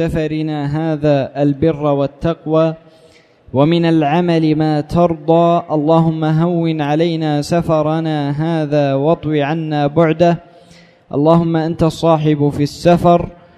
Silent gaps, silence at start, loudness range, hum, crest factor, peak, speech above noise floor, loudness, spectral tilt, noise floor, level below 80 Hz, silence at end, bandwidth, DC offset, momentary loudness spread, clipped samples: none; 0 s; 2 LU; none; 14 dB; 0 dBFS; 33 dB; -15 LUFS; -8 dB/octave; -47 dBFS; -42 dBFS; 0.25 s; 12 kHz; under 0.1%; 6 LU; under 0.1%